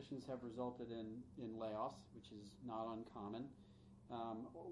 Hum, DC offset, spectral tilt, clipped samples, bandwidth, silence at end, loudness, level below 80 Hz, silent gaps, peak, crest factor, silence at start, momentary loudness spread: none; under 0.1%; -7 dB/octave; under 0.1%; 11 kHz; 0 s; -50 LUFS; -76 dBFS; none; -32 dBFS; 18 dB; 0 s; 11 LU